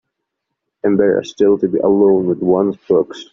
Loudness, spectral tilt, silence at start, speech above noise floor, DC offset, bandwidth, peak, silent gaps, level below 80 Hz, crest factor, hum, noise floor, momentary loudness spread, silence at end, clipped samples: -15 LUFS; -7 dB/octave; 0.85 s; 62 dB; under 0.1%; 7.2 kHz; -2 dBFS; none; -54 dBFS; 14 dB; none; -76 dBFS; 4 LU; 0.1 s; under 0.1%